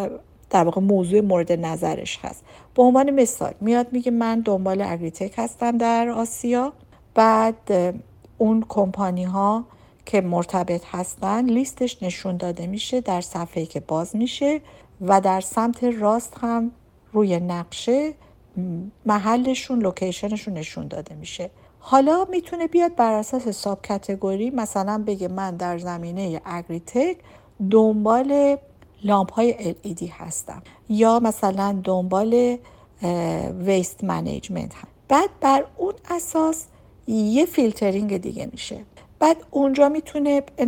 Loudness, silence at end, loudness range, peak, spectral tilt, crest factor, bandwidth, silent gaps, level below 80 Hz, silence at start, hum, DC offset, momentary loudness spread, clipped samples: -22 LUFS; 0 s; 4 LU; -2 dBFS; -6 dB/octave; 20 dB; 18 kHz; none; -54 dBFS; 0 s; none; under 0.1%; 13 LU; under 0.1%